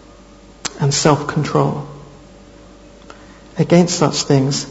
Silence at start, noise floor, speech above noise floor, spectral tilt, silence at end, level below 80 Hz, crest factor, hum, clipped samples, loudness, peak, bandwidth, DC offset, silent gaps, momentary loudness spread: 0.65 s; -42 dBFS; 27 dB; -5 dB/octave; 0 s; -46 dBFS; 18 dB; none; under 0.1%; -16 LUFS; 0 dBFS; 8 kHz; under 0.1%; none; 16 LU